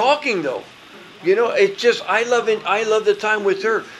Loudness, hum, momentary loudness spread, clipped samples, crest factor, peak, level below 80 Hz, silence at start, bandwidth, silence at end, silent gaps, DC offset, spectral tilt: -18 LUFS; none; 6 LU; under 0.1%; 16 dB; -2 dBFS; -68 dBFS; 0 s; 12 kHz; 0 s; none; under 0.1%; -3.5 dB/octave